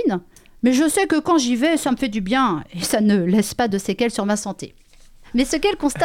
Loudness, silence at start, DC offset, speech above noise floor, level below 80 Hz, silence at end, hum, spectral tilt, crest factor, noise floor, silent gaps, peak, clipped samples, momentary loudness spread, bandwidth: -20 LUFS; 0 s; under 0.1%; 27 dB; -44 dBFS; 0 s; none; -4.5 dB/octave; 14 dB; -46 dBFS; none; -6 dBFS; under 0.1%; 7 LU; 16.5 kHz